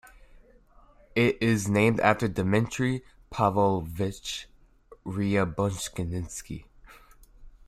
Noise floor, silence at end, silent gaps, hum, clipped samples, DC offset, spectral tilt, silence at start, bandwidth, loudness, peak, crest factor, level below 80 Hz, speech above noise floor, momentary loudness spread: -56 dBFS; 0.2 s; none; none; under 0.1%; under 0.1%; -5.5 dB/octave; 1.15 s; 15 kHz; -27 LUFS; -6 dBFS; 22 dB; -50 dBFS; 30 dB; 14 LU